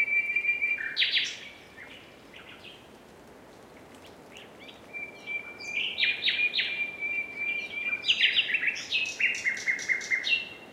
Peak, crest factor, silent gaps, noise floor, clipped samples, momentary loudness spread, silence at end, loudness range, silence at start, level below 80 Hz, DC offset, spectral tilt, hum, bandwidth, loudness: -10 dBFS; 22 dB; none; -51 dBFS; under 0.1%; 22 LU; 0 s; 20 LU; 0 s; -70 dBFS; under 0.1%; 0 dB/octave; none; 16 kHz; -27 LUFS